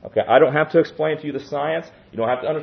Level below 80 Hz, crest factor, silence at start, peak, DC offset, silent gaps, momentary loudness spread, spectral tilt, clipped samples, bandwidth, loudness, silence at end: -62 dBFS; 18 dB; 0.05 s; -2 dBFS; under 0.1%; none; 12 LU; -7.5 dB/octave; under 0.1%; 6.4 kHz; -20 LUFS; 0 s